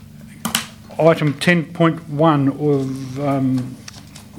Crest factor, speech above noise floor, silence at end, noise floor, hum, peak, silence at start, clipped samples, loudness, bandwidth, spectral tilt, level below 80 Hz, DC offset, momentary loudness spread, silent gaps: 18 dB; 21 dB; 0 s; -38 dBFS; none; 0 dBFS; 0 s; under 0.1%; -18 LUFS; 19 kHz; -6 dB/octave; -54 dBFS; under 0.1%; 15 LU; none